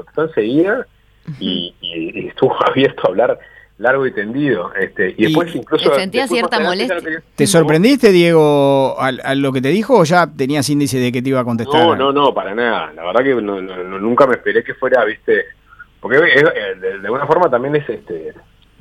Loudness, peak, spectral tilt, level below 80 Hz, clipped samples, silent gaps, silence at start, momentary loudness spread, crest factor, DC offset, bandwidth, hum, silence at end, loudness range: -15 LUFS; 0 dBFS; -5 dB/octave; -52 dBFS; under 0.1%; none; 0.15 s; 12 LU; 14 dB; under 0.1%; 15 kHz; none; 0.5 s; 4 LU